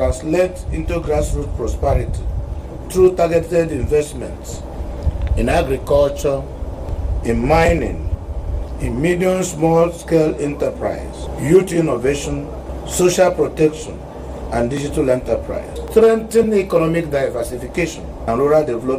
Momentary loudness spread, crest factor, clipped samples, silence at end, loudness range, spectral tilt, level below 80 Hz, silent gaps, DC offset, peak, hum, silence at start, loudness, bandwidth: 13 LU; 16 dB; under 0.1%; 0 s; 2 LU; -6 dB/octave; -28 dBFS; none; under 0.1%; 0 dBFS; none; 0 s; -18 LUFS; 16 kHz